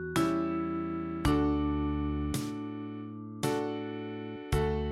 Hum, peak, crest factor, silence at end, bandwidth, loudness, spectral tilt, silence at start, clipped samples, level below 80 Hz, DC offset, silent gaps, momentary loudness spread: none; -14 dBFS; 18 dB; 0 s; 15.5 kHz; -33 LUFS; -6.5 dB/octave; 0 s; under 0.1%; -42 dBFS; under 0.1%; none; 11 LU